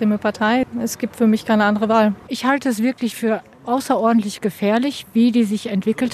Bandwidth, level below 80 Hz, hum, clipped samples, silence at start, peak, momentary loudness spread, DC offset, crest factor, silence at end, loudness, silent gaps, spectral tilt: 14 kHz; -58 dBFS; none; under 0.1%; 0 s; -2 dBFS; 7 LU; under 0.1%; 16 dB; 0 s; -19 LUFS; none; -5.5 dB/octave